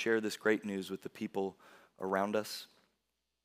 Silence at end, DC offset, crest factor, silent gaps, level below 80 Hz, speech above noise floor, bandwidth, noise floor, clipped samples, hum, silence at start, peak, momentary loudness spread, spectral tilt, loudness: 0.8 s; under 0.1%; 20 dB; none; -84 dBFS; 49 dB; 16 kHz; -85 dBFS; under 0.1%; none; 0 s; -16 dBFS; 11 LU; -4.5 dB/octave; -36 LUFS